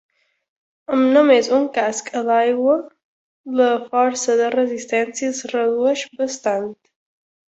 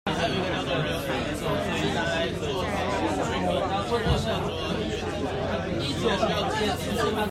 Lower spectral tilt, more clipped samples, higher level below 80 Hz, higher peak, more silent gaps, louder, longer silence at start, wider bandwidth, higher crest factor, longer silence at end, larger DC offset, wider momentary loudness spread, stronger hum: second, -3 dB/octave vs -5 dB/octave; neither; second, -68 dBFS vs -42 dBFS; first, -2 dBFS vs -10 dBFS; first, 3.04-3.44 s vs none; first, -18 LUFS vs -27 LUFS; first, 0.9 s vs 0.05 s; second, 8.2 kHz vs 16 kHz; about the same, 16 dB vs 16 dB; first, 0.75 s vs 0 s; neither; first, 10 LU vs 4 LU; neither